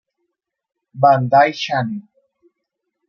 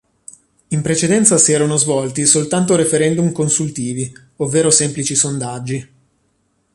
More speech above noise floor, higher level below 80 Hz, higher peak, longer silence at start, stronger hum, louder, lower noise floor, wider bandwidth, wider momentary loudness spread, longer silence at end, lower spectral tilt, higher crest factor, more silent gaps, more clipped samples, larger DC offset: first, 62 dB vs 48 dB; second, -68 dBFS vs -54 dBFS; about the same, -2 dBFS vs 0 dBFS; first, 0.95 s vs 0.7 s; neither; about the same, -16 LUFS vs -15 LUFS; first, -77 dBFS vs -63 dBFS; second, 6.8 kHz vs 11.5 kHz; about the same, 13 LU vs 12 LU; first, 1.05 s vs 0.9 s; first, -6 dB/octave vs -4 dB/octave; about the same, 18 dB vs 16 dB; neither; neither; neither